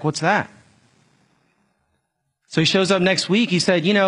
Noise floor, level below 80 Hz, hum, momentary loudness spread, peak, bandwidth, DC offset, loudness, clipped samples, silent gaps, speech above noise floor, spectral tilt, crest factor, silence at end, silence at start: -73 dBFS; -62 dBFS; none; 6 LU; -2 dBFS; 11 kHz; under 0.1%; -18 LUFS; under 0.1%; none; 55 dB; -4.5 dB/octave; 18 dB; 0 s; 0 s